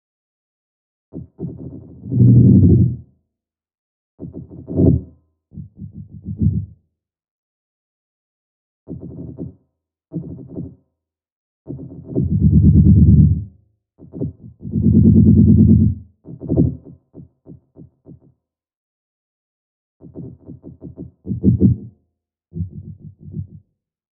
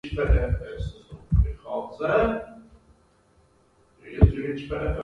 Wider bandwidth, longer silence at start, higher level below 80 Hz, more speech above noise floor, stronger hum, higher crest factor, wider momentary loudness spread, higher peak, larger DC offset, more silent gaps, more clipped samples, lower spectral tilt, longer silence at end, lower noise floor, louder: second, 1.1 kHz vs 5.8 kHz; first, 1.15 s vs 0.05 s; about the same, -30 dBFS vs -30 dBFS; first, 72 dB vs 36 dB; neither; second, 18 dB vs 24 dB; first, 26 LU vs 15 LU; about the same, 0 dBFS vs -2 dBFS; neither; first, 3.78-4.18 s, 7.31-8.86 s, 11.32-11.65 s, 18.76-20.00 s vs none; neither; first, -19.5 dB/octave vs -9 dB/octave; first, 0.7 s vs 0 s; first, -85 dBFS vs -61 dBFS; first, -14 LUFS vs -26 LUFS